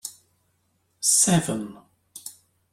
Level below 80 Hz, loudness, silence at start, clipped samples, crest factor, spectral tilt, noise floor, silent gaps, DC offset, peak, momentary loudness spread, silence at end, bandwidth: -60 dBFS; -20 LUFS; 0.05 s; under 0.1%; 22 dB; -3 dB/octave; -70 dBFS; none; under 0.1%; -6 dBFS; 22 LU; 0.4 s; 16.5 kHz